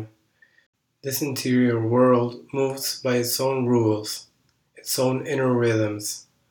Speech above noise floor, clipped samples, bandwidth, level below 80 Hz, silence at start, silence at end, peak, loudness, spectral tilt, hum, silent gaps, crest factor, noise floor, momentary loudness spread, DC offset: 38 dB; under 0.1%; over 20 kHz; -70 dBFS; 0 s; 0.3 s; -6 dBFS; -23 LUFS; -5 dB/octave; none; 0.66-0.73 s; 16 dB; -60 dBFS; 12 LU; under 0.1%